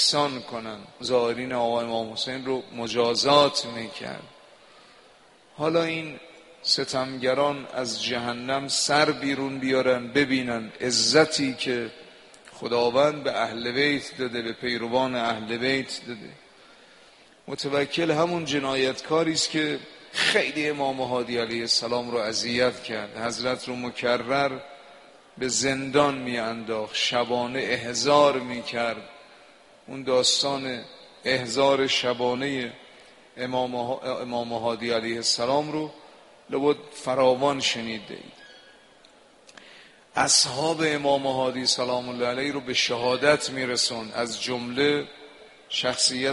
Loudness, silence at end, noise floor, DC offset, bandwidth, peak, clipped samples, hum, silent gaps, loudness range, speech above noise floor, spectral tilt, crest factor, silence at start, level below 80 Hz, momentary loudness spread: -25 LUFS; 0 s; -55 dBFS; under 0.1%; 11.5 kHz; -4 dBFS; under 0.1%; none; none; 4 LU; 30 dB; -3 dB/octave; 22 dB; 0 s; -64 dBFS; 12 LU